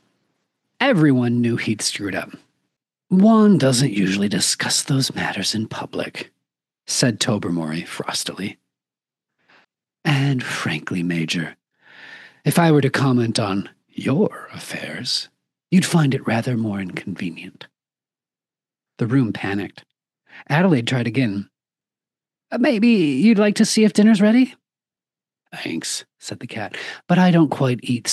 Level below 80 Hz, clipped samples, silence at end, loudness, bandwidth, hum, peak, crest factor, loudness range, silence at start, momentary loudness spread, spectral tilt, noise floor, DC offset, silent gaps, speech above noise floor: -74 dBFS; under 0.1%; 0 s; -19 LUFS; 12.5 kHz; none; -2 dBFS; 18 dB; 8 LU; 0.8 s; 16 LU; -5 dB/octave; under -90 dBFS; under 0.1%; none; over 71 dB